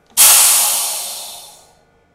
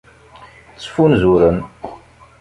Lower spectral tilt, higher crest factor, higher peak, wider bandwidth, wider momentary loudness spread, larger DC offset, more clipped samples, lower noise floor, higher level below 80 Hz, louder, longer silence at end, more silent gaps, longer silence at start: second, 3.5 dB/octave vs -8 dB/octave; about the same, 16 dB vs 16 dB; about the same, 0 dBFS vs -2 dBFS; first, over 20 kHz vs 11 kHz; about the same, 21 LU vs 22 LU; neither; first, 0.2% vs under 0.1%; first, -52 dBFS vs -43 dBFS; second, -60 dBFS vs -38 dBFS; first, -9 LUFS vs -14 LUFS; first, 0.7 s vs 0.45 s; neither; second, 0.15 s vs 0.8 s